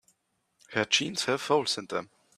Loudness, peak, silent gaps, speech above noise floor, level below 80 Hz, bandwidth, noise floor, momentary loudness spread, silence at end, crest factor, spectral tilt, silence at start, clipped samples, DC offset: -28 LUFS; -8 dBFS; none; 46 dB; -74 dBFS; 14.5 kHz; -75 dBFS; 10 LU; 0.3 s; 22 dB; -2.5 dB/octave; 0.7 s; under 0.1%; under 0.1%